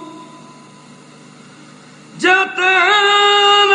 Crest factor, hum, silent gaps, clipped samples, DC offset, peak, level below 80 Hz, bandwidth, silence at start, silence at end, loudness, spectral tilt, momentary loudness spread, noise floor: 14 dB; none; none; under 0.1%; under 0.1%; 0 dBFS; -72 dBFS; 10.5 kHz; 0 s; 0 s; -11 LUFS; -1.5 dB/octave; 4 LU; -41 dBFS